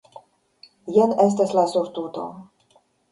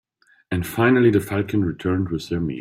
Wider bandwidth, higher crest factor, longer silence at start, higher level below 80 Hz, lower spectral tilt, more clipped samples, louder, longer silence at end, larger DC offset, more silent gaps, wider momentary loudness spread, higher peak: second, 11.5 kHz vs 16 kHz; about the same, 18 dB vs 16 dB; first, 0.85 s vs 0.5 s; second, -68 dBFS vs -50 dBFS; about the same, -6.5 dB/octave vs -7 dB/octave; neither; about the same, -21 LUFS vs -21 LUFS; first, 0.7 s vs 0 s; neither; neither; first, 16 LU vs 10 LU; about the same, -4 dBFS vs -4 dBFS